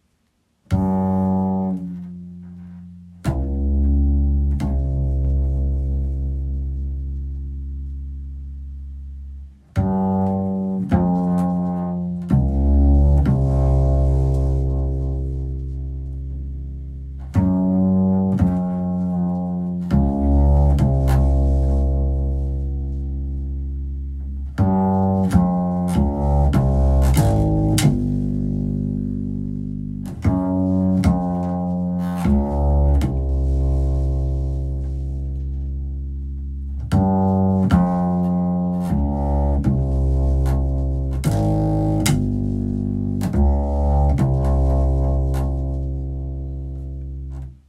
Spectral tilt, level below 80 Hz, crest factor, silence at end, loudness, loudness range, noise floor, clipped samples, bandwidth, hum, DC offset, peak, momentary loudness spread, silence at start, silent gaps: -8.5 dB/octave; -22 dBFS; 16 dB; 0.15 s; -21 LUFS; 6 LU; -66 dBFS; under 0.1%; 13 kHz; none; under 0.1%; -2 dBFS; 13 LU; 0.7 s; none